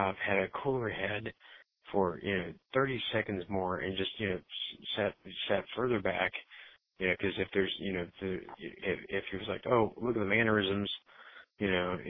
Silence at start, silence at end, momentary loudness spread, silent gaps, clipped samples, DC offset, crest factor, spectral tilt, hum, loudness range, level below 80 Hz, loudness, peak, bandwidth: 0 s; 0 s; 9 LU; none; under 0.1%; under 0.1%; 20 dB; -8.5 dB/octave; none; 2 LU; -62 dBFS; -34 LUFS; -14 dBFS; 5.4 kHz